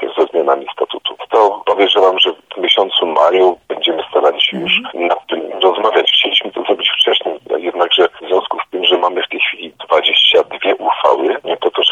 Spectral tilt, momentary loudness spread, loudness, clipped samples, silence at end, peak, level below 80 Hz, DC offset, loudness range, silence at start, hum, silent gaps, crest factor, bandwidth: -3.5 dB/octave; 8 LU; -13 LUFS; under 0.1%; 0 s; 0 dBFS; -66 dBFS; under 0.1%; 2 LU; 0 s; none; none; 14 dB; 10 kHz